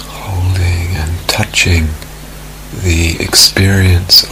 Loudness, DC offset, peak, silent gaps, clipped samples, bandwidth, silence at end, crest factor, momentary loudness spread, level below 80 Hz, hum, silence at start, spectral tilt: -10 LUFS; under 0.1%; 0 dBFS; none; 0.6%; over 20 kHz; 0 s; 12 dB; 21 LU; -24 dBFS; none; 0 s; -3 dB/octave